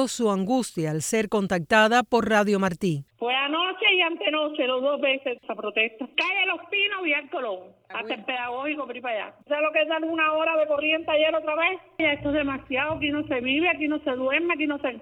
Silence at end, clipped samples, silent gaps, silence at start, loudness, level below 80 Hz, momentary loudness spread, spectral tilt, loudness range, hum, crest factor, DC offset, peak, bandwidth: 0 s; under 0.1%; none; 0 s; -24 LUFS; -58 dBFS; 9 LU; -4 dB/octave; 4 LU; none; 18 dB; under 0.1%; -6 dBFS; 19 kHz